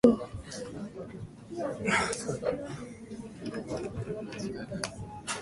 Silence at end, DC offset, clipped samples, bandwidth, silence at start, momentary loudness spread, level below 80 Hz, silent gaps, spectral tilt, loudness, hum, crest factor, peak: 0 s; under 0.1%; under 0.1%; 11.5 kHz; 0.05 s; 15 LU; -56 dBFS; none; -5 dB/octave; -35 LUFS; none; 26 dB; -6 dBFS